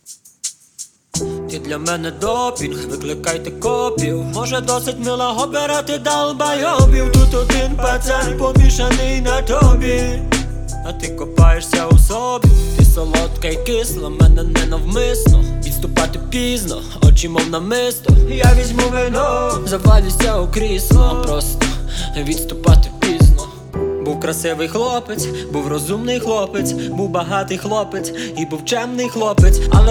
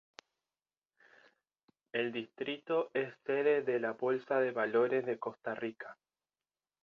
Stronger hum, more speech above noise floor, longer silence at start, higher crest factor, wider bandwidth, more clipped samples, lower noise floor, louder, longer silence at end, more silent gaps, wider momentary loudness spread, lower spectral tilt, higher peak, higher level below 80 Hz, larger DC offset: neither; second, 24 dB vs over 56 dB; second, 0.1 s vs 1.95 s; about the same, 14 dB vs 18 dB; first, 17 kHz vs 7 kHz; neither; second, -38 dBFS vs under -90 dBFS; first, -16 LUFS vs -35 LUFS; second, 0 s vs 0.9 s; neither; about the same, 11 LU vs 10 LU; first, -5 dB/octave vs -3.5 dB/octave; first, 0 dBFS vs -18 dBFS; first, -16 dBFS vs -84 dBFS; neither